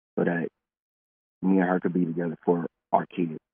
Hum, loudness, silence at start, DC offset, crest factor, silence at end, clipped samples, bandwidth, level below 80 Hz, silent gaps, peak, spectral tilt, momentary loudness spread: none; -27 LUFS; 0.15 s; under 0.1%; 20 dB; 0.15 s; under 0.1%; 3.5 kHz; -78 dBFS; 0.80-1.41 s; -6 dBFS; -8 dB/octave; 8 LU